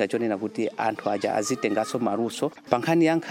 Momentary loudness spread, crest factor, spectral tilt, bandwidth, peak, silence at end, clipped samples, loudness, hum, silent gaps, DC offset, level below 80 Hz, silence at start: 7 LU; 20 dB; -5 dB/octave; 16 kHz; -4 dBFS; 0 s; under 0.1%; -25 LUFS; none; none; under 0.1%; -70 dBFS; 0 s